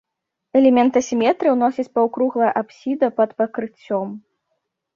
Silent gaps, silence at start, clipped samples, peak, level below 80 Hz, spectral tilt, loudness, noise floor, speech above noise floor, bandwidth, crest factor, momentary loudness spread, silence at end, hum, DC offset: none; 0.55 s; under 0.1%; -4 dBFS; -66 dBFS; -5.5 dB/octave; -19 LUFS; -74 dBFS; 56 dB; 7.2 kHz; 16 dB; 10 LU; 0.75 s; none; under 0.1%